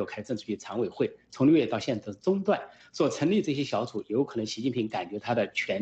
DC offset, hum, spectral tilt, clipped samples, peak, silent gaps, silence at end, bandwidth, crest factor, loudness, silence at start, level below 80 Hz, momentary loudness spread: under 0.1%; none; -6 dB/octave; under 0.1%; -12 dBFS; none; 0 s; 8.4 kHz; 16 dB; -29 LUFS; 0 s; -68 dBFS; 9 LU